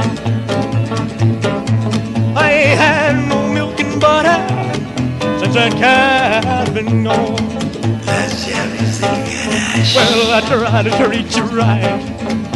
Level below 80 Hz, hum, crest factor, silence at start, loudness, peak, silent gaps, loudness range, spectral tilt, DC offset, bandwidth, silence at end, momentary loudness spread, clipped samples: -40 dBFS; none; 14 dB; 0 s; -14 LUFS; 0 dBFS; none; 2 LU; -5 dB/octave; 0.2%; 12 kHz; 0 s; 8 LU; under 0.1%